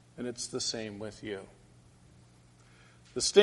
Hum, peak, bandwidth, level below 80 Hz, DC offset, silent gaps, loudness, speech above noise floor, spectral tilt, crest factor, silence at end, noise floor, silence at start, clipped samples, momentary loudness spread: none; -8 dBFS; 11.5 kHz; -64 dBFS; under 0.1%; none; -34 LUFS; 29 dB; -2.5 dB/octave; 26 dB; 0 s; -59 dBFS; 0.15 s; under 0.1%; 12 LU